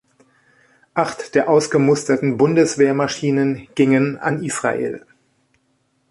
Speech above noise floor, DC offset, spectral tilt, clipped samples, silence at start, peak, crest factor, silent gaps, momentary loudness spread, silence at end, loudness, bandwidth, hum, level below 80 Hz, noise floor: 48 dB; under 0.1%; -5.5 dB/octave; under 0.1%; 0.95 s; -2 dBFS; 16 dB; none; 7 LU; 1.1 s; -18 LUFS; 11.5 kHz; none; -60 dBFS; -65 dBFS